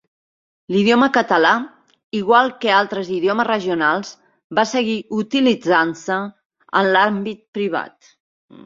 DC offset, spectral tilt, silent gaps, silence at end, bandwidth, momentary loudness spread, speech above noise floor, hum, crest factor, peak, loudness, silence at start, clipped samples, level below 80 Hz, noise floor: under 0.1%; -5 dB/octave; 2.04-2.10 s, 4.44-4.50 s, 6.46-6.50 s, 7.48-7.53 s; 0.8 s; 7.6 kHz; 11 LU; over 73 dB; none; 18 dB; 0 dBFS; -18 LUFS; 0.7 s; under 0.1%; -64 dBFS; under -90 dBFS